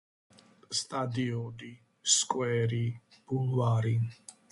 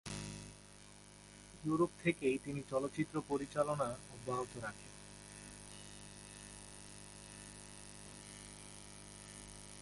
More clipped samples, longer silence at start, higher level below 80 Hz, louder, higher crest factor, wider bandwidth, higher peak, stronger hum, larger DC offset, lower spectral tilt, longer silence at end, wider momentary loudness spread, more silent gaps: neither; first, 0.7 s vs 0.05 s; about the same, -66 dBFS vs -64 dBFS; first, -30 LUFS vs -42 LUFS; about the same, 20 dB vs 24 dB; about the same, 11.5 kHz vs 11.5 kHz; first, -12 dBFS vs -20 dBFS; second, none vs 50 Hz at -65 dBFS; neither; about the same, -4 dB/octave vs -5 dB/octave; first, 0.2 s vs 0 s; about the same, 18 LU vs 17 LU; neither